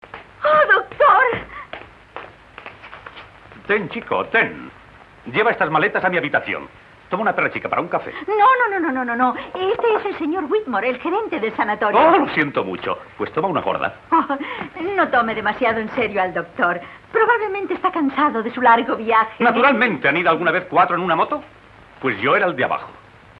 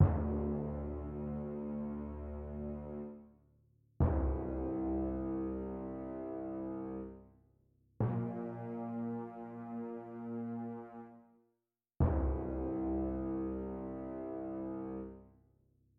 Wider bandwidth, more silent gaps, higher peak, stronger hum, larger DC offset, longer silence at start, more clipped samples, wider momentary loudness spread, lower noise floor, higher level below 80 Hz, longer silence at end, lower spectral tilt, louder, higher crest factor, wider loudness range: first, 6 kHz vs 3.1 kHz; neither; first, -4 dBFS vs -16 dBFS; neither; neither; first, 0.15 s vs 0 s; neither; first, 14 LU vs 11 LU; second, -41 dBFS vs -86 dBFS; second, -56 dBFS vs -46 dBFS; second, 0.4 s vs 0.7 s; second, -7.5 dB/octave vs -12 dB/octave; first, -18 LUFS vs -40 LUFS; second, 16 dB vs 22 dB; about the same, 4 LU vs 5 LU